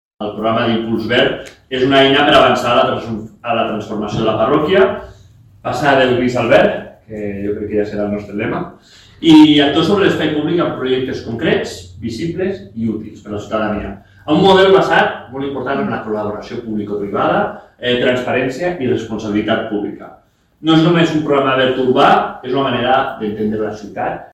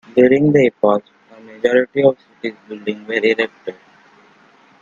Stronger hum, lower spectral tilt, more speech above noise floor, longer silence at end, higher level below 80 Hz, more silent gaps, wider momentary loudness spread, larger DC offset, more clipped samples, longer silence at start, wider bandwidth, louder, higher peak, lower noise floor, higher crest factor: neither; about the same, -6 dB/octave vs -7 dB/octave; second, 29 dB vs 35 dB; second, 0.1 s vs 1.1 s; first, -44 dBFS vs -60 dBFS; neither; about the same, 14 LU vs 16 LU; neither; neither; about the same, 0.2 s vs 0.15 s; first, 12 kHz vs 7.4 kHz; about the same, -15 LUFS vs -16 LUFS; about the same, 0 dBFS vs 0 dBFS; second, -44 dBFS vs -50 dBFS; about the same, 14 dB vs 18 dB